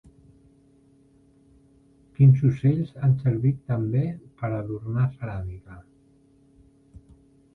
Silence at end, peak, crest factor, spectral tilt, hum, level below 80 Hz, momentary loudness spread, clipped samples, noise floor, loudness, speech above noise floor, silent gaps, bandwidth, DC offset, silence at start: 1.75 s; -8 dBFS; 18 dB; -11 dB/octave; none; -52 dBFS; 16 LU; under 0.1%; -58 dBFS; -24 LUFS; 36 dB; none; 3.9 kHz; under 0.1%; 2.2 s